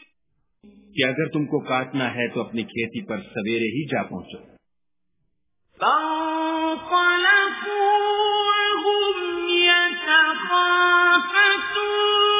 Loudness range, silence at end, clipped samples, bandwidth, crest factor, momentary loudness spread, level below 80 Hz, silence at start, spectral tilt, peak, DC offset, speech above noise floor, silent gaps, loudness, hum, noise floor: 10 LU; 0 s; under 0.1%; 3.9 kHz; 18 dB; 12 LU; -64 dBFS; 0.95 s; -7.5 dB/octave; -4 dBFS; under 0.1%; 57 dB; none; -20 LUFS; none; -82 dBFS